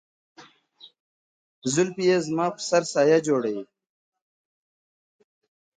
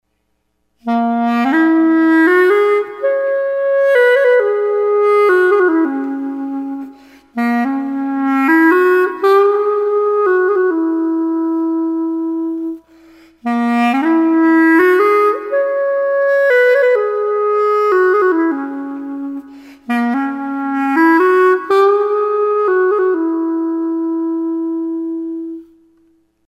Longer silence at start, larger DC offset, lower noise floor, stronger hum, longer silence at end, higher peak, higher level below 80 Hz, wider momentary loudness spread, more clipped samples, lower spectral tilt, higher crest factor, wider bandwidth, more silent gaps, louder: second, 0.4 s vs 0.85 s; neither; second, -54 dBFS vs -66 dBFS; second, none vs 60 Hz at -65 dBFS; first, 2.15 s vs 0.85 s; second, -6 dBFS vs -2 dBFS; second, -72 dBFS vs -64 dBFS; about the same, 10 LU vs 12 LU; neither; about the same, -4.5 dB/octave vs -5.5 dB/octave; first, 20 dB vs 12 dB; second, 9.6 kHz vs 13 kHz; first, 1.00-1.62 s vs none; second, -23 LUFS vs -14 LUFS